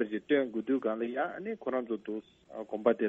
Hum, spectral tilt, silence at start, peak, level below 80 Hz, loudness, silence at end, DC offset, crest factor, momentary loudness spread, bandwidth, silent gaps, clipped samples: none; -7.5 dB/octave; 0 s; -12 dBFS; -76 dBFS; -33 LUFS; 0 s; under 0.1%; 22 dB; 12 LU; 7.2 kHz; none; under 0.1%